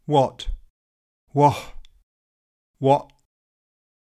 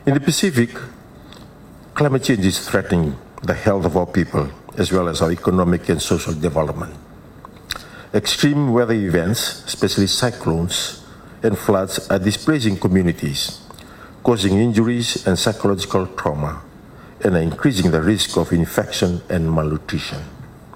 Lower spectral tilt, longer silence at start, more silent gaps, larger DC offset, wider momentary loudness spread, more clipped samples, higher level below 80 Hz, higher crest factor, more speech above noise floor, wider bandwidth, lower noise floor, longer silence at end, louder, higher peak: first, -7 dB/octave vs -5 dB/octave; about the same, 0.1 s vs 0 s; first, 0.70-1.27 s, 2.03-2.74 s vs none; neither; first, 19 LU vs 11 LU; neither; about the same, -42 dBFS vs -40 dBFS; first, 22 dB vs 16 dB; first, over 71 dB vs 23 dB; second, 14 kHz vs 17 kHz; first, under -90 dBFS vs -41 dBFS; first, 1.1 s vs 0.1 s; about the same, -21 LUFS vs -19 LUFS; about the same, -4 dBFS vs -4 dBFS